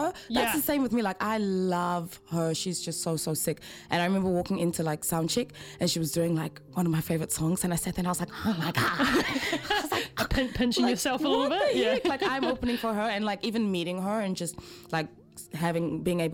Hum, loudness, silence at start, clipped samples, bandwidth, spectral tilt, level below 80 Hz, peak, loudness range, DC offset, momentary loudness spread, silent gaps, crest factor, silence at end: none; -28 LUFS; 0 s; under 0.1%; 17 kHz; -4.5 dB/octave; -50 dBFS; -10 dBFS; 3 LU; under 0.1%; 7 LU; none; 18 dB; 0 s